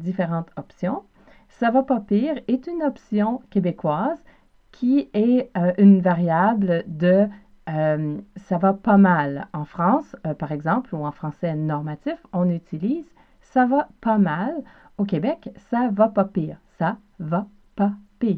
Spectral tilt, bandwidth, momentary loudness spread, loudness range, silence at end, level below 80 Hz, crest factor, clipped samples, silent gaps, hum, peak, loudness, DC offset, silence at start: -10 dB/octave; 4.8 kHz; 12 LU; 6 LU; 0 s; -58 dBFS; 18 dB; under 0.1%; none; none; -4 dBFS; -22 LUFS; under 0.1%; 0 s